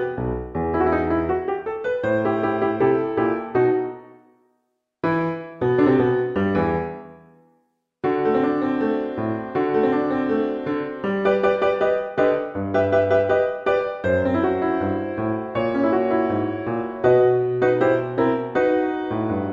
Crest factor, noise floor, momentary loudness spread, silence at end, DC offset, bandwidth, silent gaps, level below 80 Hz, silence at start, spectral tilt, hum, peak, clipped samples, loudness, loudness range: 16 dB; -72 dBFS; 7 LU; 0 s; under 0.1%; 7 kHz; none; -50 dBFS; 0 s; -9 dB/octave; none; -4 dBFS; under 0.1%; -21 LUFS; 3 LU